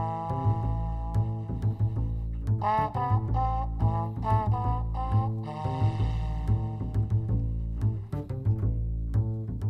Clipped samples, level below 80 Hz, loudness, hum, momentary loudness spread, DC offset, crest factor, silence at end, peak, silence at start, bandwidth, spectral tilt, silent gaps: under 0.1%; -34 dBFS; -29 LUFS; none; 5 LU; under 0.1%; 14 dB; 0 s; -12 dBFS; 0 s; 5 kHz; -9.5 dB/octave; none